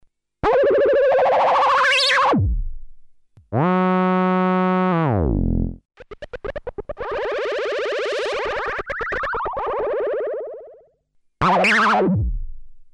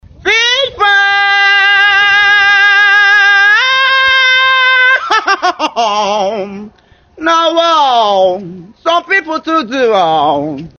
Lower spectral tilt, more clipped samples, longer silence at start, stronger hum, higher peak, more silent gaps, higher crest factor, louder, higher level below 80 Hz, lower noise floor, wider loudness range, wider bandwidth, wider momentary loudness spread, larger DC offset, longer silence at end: first, -6 dB/octave vs -2 dB/octave; neither; first, 0.45 s vs 0.25 s; neither; second, -6 dBFS vs 0 dBFS; neither; about the same, 14 dB vs 10 dB; second, -19 LUFS vs -8 LUFS; first, -34 dBFS vs -50 dBFS; first, -62 dBFS vs -44 dBFS; about the same, 8 LU vs 6 LU; first, 11.5 kHz vs 7 kHz; first, 16 LU vs 8 LU; neither; about the same, 0.05 s vs 0.1 s